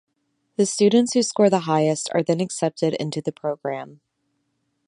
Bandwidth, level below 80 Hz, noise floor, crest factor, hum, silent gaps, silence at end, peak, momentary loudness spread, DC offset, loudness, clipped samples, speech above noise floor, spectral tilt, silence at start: 11 kHz; -72 dBFS; -73 dBFS; 18 dB; none; none; 0.95 s; -4 dBFS; 12 LU; under 0.1%; -21 LUFS; under 0.1%; 52 dB; -5 dB/octave; 0.6 s